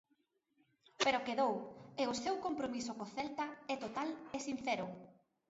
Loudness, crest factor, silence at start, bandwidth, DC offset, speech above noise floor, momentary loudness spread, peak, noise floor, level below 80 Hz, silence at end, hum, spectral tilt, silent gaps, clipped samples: -39 LUFS; 20 dB; 1 s; 7.6 kHz; under 0.1%; 41 dB; 9 LU; -20 dBFS; -80 dBFS; -76 dBFS; 0.35 s; none; -2 dB/octave; none; under 0.1%